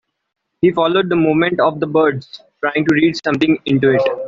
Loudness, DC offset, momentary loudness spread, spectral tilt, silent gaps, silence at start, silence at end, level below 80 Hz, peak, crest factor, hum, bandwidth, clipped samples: -15 LUFS; under 0.1%; 4 LU; -7 dB/octave; none; 0.6 s; 0 s; -54 dBFS; -2 dBFS; 14 dB; none; 7.4 kHz; under 0.1%